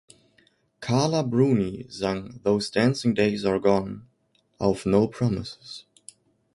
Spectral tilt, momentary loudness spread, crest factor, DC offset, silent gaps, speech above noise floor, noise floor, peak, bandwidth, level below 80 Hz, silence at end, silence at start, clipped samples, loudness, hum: -6.5 dB/octave; 15 LU; 20 dB; under 0.1%; none; 43 dB; -67 dBFS; -6 dBFS; 11.5 kHz; -54 dBFS; 0.75 s; 0.8 s; under 0.1%; -24 LUFS; none